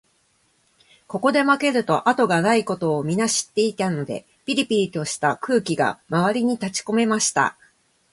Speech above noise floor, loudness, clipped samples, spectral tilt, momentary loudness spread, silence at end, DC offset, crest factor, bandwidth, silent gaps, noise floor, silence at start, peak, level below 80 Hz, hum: 43 dB; -21 LUFS; under 0.1%; -4 dB/octave; 6 LU; 0.6 s; under 0.1%; 18 dB; 11.5 kHz; none; -64 dBFS; 1.1 s; -4 dBFS; -64 dBFS; none